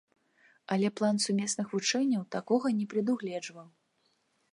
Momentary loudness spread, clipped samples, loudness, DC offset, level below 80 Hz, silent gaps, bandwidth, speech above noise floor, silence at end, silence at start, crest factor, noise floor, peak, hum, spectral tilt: 6 LU; under 0.1%; -30 LUFS; under 0.1%; -82 dBFS; none; 11.5 kHz; 44 dB; 0.85 s; 0.7 s; 18 dB; -74 dBFS; -14 dBFS; none; -4.5 dB/octave